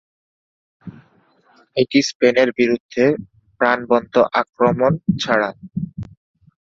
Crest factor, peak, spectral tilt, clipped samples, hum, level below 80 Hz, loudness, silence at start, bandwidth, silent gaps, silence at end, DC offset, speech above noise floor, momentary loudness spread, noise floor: 20 dB; 0 dBFS; -5.5 dB/octave; under 0.1%; none; -54 dBFS; -18 LUFS; 0.85 s; 7.8 kHz; 2.15-2.20 s, 2.80-2.89 s, 4.49-4.53 s; 0.6 s; under 0.1%; 39 dB; 13 LU; -57 dBFS